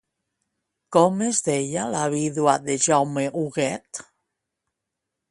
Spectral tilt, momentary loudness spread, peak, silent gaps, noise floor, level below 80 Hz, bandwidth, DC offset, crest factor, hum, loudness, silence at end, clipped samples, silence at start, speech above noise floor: -4.5 dB/octave; 7 LU; -2 dBFS; none; -83 dBFS; -66 dBFS; 11.5 kHz; under 0.1%; 22 dB; none; -22 LUFS; 1.3 s; under 0.1%; 0.9 s; 61 dB